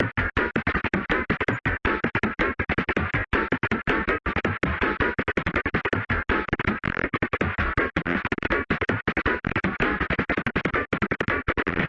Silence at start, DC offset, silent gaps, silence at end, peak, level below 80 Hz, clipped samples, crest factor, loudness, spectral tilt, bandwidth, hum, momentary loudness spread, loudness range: 0 s; under 0.1%; none; 0 s; -6 dBFS; -38 dBFS; under 0.1%; 18 dB; -25 LUFS; -7.5 dB/octave; 8 kHz; none; 2 LU; 1 LU